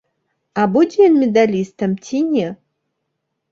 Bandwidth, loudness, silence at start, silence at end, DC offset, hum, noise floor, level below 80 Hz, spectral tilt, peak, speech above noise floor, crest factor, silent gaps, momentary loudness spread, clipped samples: 7.6 kHz; -16 LUFS; 0.55 s; 0.95 s; under 0.1%; none; -74 dBFS; -62 dBFS; -7 dB/octave; -2 dBFS; 59 dB; 16 dB; none; 10 LU; under 0.1%